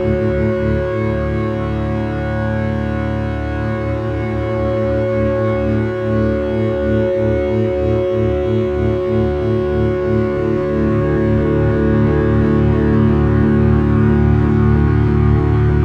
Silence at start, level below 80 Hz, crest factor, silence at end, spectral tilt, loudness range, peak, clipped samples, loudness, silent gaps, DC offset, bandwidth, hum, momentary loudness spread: 0 s; -26 dBFS; 12 dB; 0 s; -10 dB/octave; 6 LU; -2 dBFS; under 0.1%; -16 LUFS; none; under 0.1%; 6 kHz; none; 6 LU